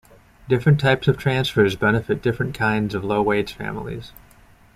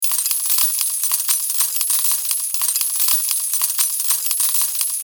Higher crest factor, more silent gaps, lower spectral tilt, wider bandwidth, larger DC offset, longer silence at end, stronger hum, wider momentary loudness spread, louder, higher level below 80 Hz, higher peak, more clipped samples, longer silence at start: about the same, 18 dB vs 18 dB; neither; first, -7 dB/octave vs 7 dB/octave; second, 15 kHz vs over 20 kHz; neither; first, 0.65 s vs 0 s; neither; first, 12 LU vs 3 LU; second, -21 LUFS vs -16 LUFS; first, -46 dBFS vs under -90 dBFS; second, -4 dBFS vs 0 dBFS; neither; first, 0.45 s vs 0 s